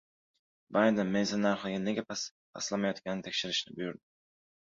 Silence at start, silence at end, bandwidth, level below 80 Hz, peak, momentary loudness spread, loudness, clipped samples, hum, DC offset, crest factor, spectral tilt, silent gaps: 0.7 s; 0.75 s; 7.8 kHz; -72 dBFS; -14 dBFS; 12 LU; -32 LUFS; under 0.1%; none; under 0.1%; 20 dB; -4 dB/octave; 2.31-2.53 s